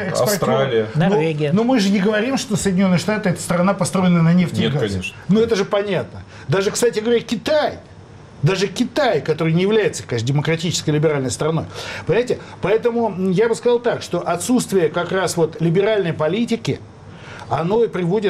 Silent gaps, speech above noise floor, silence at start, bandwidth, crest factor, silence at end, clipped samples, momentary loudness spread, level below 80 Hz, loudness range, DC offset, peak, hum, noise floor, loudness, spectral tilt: none; 22 dB; 0 s; 15 kHz; 10 dB; 0 s; under 0.1%; 7 LU; -52 dBFS; 2 LU; under 0.1%; -8 dBFS; none; -40 dBFS; -18 LUFS; -5.5 dB/octave